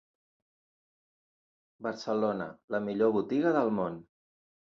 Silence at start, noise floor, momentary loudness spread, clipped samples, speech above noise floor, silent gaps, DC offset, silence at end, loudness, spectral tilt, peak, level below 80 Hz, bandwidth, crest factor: 1.8 s; under -90 dBFS; 11 LU; under 0.1%; over 60 dB; 2.64-2.68 s; under 0.1%; 0.65 s; -31 LUFS; -7 dB/octave; -14 dBFS; -72 dBFS; 7.4 kHz; 20 dB